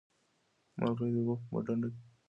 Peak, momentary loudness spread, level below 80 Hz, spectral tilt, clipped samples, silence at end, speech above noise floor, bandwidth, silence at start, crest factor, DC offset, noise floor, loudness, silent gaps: -16 dBFS; 6 LU; -70 dBFS; -10 dB/octave; under 0.1%; 0.25 s; 41 dB; 5.8 kHz; 0.75 s; 20 dB; under 0.1%; -75 dBFS; -35 LUFS; none